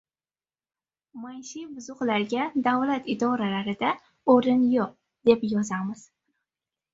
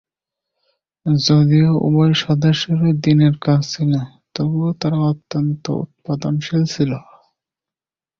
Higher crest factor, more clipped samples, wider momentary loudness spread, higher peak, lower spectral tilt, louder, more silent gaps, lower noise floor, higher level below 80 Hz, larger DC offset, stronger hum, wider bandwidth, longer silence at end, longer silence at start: first, 22 dB vs 14 dB; neither; first, 17 LU vs 10 LU; second, -6 dBFS vs -2 dBFS; second, -5.5 dB/octave vs -7 dB/octave; second, -25 LUFS vs -17 LUFS; neither; about the same, under -90 dBFS vs under -90 dBFS; second, -66 dBFS vs -52 dBFS; neither; neither; first, 7.8 kHz vs 7 kHz; second, 1 s vs 1.2 s; about the same, 1.15 s vs 1.05 s